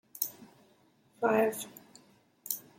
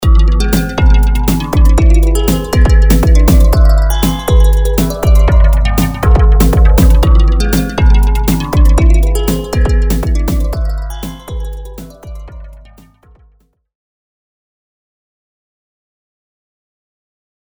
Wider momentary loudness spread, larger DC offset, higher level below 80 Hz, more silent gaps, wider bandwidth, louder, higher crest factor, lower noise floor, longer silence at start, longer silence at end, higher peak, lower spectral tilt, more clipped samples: first, 21 LU vs 15 LU; neither; second, -80 dBFS vs -10 dBFS; neither; second, 16.5 kHz vs over 20 kHz; second, -32 LUFS vs -11 LUFS; first, 24 dB vs 10 dB; first, -66 dBFS vs -51 dBFS; first, 0.15 s vs 0 s; second, 0.2 s vs 5 s; second, -12 dBFS vs 0 dBFS; second, -3.5 dB/octave vs -6.5 dB/octave; second, under 0.1% vs 0.2%